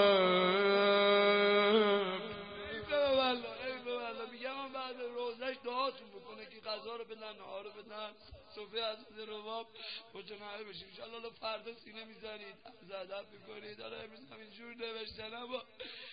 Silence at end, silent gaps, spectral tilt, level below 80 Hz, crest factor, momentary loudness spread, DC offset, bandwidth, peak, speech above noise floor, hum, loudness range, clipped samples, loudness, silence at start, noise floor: 0 s; none; -1.5 dB/octave; -72 dBFS; 20 dB; 22 LU; under 0.1%; 5 kHz; -16 dBFS; 8 dB; none; 16 LU; under 0.1%; -34 LUFS; 0 s; -55 dBFS